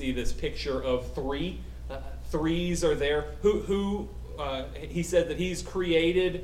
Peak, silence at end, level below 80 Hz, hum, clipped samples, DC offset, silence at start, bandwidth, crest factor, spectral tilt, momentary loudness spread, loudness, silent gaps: -12 dBFS; 0 s; -38 dBFS; none; under 0.1%; under 0.1%; 0 s; 15.5 kHz; 16 dB; -5.5 dB/octave; 11 LU; -29 LUFS; none